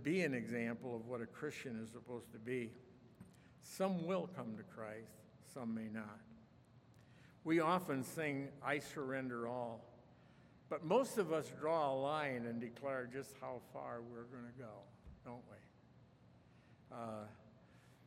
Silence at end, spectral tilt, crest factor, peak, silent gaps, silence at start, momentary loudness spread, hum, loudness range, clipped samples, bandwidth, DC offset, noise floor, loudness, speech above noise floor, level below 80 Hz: 0.05 s; -6 dB/octave; 22 dB; -22 dBFS; none; 0 s; 21 LU; none; 13 LU; under 0.1%; 16 kHz; under 0.1%; -66 dBFS; -43 LUFS; 24 dB; -78 dBFS